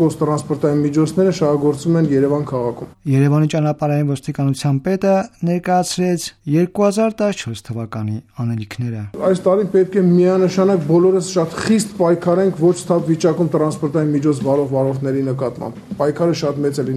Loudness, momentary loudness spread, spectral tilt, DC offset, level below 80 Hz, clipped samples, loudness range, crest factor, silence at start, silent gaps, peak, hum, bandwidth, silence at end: -17 LUFS; 10 LU; -7 dB/octave; under 0.1%; -54 dBFS; under 0.1%; 4 LU; 14 dB; 0 s; none; -2 dBFS; none; 13.5 kHz; 0 s